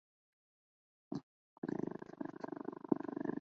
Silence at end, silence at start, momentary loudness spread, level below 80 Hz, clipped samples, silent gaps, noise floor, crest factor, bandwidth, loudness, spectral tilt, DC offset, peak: 0 s; 1.1 s; 9 LU; -82 dBFS; under 0.1%; 1.23-1.62 s; under -90 dBFS; 28 dB; 6.8 kHz; -44 LUFS; -8 dB/octave; under 0.1%; -16 dBFS